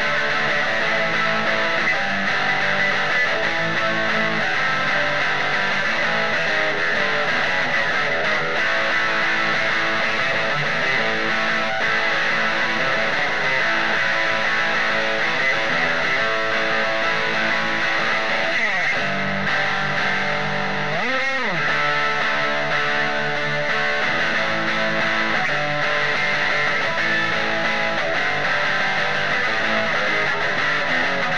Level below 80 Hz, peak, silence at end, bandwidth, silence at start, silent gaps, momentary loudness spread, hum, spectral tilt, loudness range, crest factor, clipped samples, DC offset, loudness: -60 dBFS; -4 dBFS; 0 s; 11 kHz; 0 s; none; 2 LU; none; -3.5 dB/octave; 1 LU; 16 dB; under 0.1%; 4%; -19 LUFS